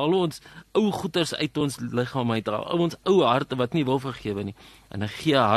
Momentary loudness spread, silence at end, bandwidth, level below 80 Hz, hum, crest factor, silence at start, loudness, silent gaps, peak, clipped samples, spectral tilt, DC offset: 11 LU; 0 s; 13 kHz; -58 dBFS; none; 18 dB; 0 s; -25 LUFS; none; -6 dBFS; under 0.1%; -6 dB/octave; under 0.1%